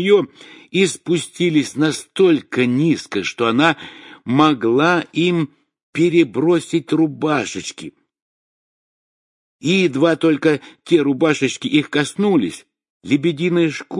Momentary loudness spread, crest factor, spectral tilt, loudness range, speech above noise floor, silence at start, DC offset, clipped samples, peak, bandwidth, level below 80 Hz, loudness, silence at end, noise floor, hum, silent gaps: 11 LU; 18 dB; -5.5 dB/octave; 4 LU; over 73 dB; 0 s; under 0.1%; under 0.1%; 0 dBFS; 11.5 kHz; -64 dBFS; -17 LUFS; 0 s; under -90 dBFS; none; 5.83-5.93 s, 8.22-9.59 s, 12.90-13.01 s